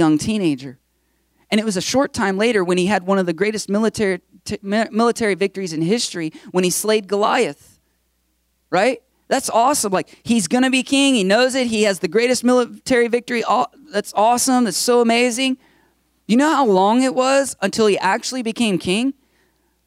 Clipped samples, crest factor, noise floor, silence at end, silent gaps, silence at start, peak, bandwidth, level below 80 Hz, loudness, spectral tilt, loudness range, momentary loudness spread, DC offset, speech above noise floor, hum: under 0.1%; 14 dB; -66 dBFS; 0.75 s; none; 0 s; -4 dBFS; 16 kHz; -58 dBFS; -18 LUFS; -4 dB/octave; 4 LU; 8 LU; under 0.1%; 49 dB; none